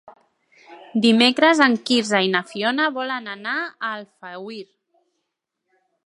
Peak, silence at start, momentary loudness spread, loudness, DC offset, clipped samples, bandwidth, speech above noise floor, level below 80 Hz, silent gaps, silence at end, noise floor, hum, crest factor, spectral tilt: 0 dBFS; 0.7 s; 20 LU; -19 LUFS; under 0.1%; under 0.1%; 11.5 kHz; 59 dB; -74 dBFS; none; 1.45 s; -79 dBFS; none; 22 dB; -3.5 dB/octave